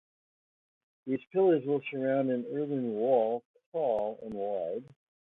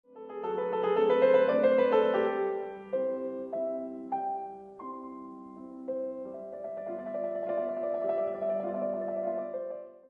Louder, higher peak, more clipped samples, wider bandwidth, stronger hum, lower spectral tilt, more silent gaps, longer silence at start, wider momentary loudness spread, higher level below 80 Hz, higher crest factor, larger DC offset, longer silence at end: about the same, -31 LUFS vs -30 LUFS; about the same, -14 dBFS vs -14 dBFS; neither; second, 4 kHz vs 4.8 kHz; neither; first, -10 dB/octave vs -7.5 dB/octave; first, 3.45-3.54 s, 3.66-3.72 s vs none; first, 1.05 s vs 0.1 s; second, 11 LU vs 18 LU; about the same, -74 dBFS vs -74 dBFS; about the same, 18 dB vs 18 dB; neither; first, 0.5 s vs 0.1 s